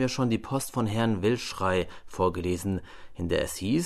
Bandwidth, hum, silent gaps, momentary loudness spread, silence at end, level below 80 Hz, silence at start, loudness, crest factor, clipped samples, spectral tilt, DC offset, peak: 13.5 kHz; none; none; 8 LU; 0 s; -50 dBFS; 0 s; -29 LUFS; 16 dB; under 0.1%; -5.5 dB/octave; under 0.1%; -12 dBFS